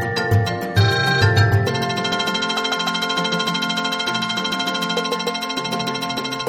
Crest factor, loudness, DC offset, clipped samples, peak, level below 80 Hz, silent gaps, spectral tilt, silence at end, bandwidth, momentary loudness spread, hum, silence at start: 16 dB; -19 LUFS; under 0.1%; under 0.1%; -4 dBFS; -48 dBFS; none; -4.5 dB/octave; 0 s; 16.5 kHz; 6 LU; none; 0 s